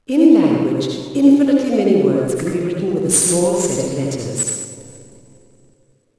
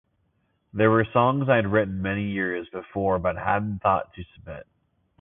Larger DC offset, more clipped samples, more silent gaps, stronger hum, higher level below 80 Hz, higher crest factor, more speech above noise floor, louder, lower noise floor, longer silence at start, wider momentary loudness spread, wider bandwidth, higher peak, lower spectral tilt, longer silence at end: first, 0.1% vs under 0.1%; neither; neither; neither; second, -54 dBFS vs -48 dBFS; about the same, 16 dB vs 20 dB; second, 40 dB vs 46 dB; first, -16 LUFS vs -24 LUFS; second, -56 dBFS vs -70 dBFS; second, 0.1 s vs 0.75 s; second, 10 LU vs 19 LU; first, 11 kHz vs 3.8 kHz; first, 0 dBFS vs -6 dBFS; second, -5 dB/octave vs -11.5 dB/octave; first, 1.15 s vs 0.6 s